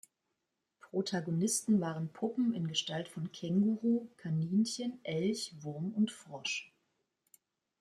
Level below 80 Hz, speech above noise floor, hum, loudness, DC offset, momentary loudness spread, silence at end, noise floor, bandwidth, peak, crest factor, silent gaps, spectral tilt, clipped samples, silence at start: -78 dBFS; 51 dB; none; -35 LUFS; under 0.1%; 9 LU; 1.15 s; -85 dBFS; 14.5 kHz; -20 dBFS; 16 dB; none; -5 dB/octave; under 0.1%; 0.85 s